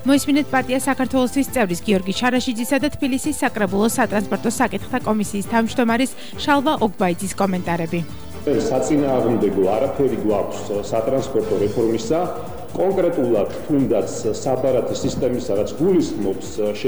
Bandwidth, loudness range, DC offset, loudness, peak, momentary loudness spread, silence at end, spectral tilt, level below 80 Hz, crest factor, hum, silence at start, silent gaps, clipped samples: over 20 kHz; 1 LU; 2%; -20 LUFS; -6 dBFS; 6 LU; 0 s; -5 dB/octave; -46 dBFS; 14 dB; none; 0 s; none; under 0.1%